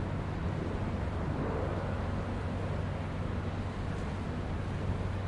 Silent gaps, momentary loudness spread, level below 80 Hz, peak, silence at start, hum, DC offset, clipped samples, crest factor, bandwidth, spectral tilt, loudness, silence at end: none; 3 LU; -42 dBFS; -22 dBFS; 0 s; none; under 0.1%; under 0.1%; 12 dB; 10.5 kHz; -8 dB/octave; -36 LUFS; 0 s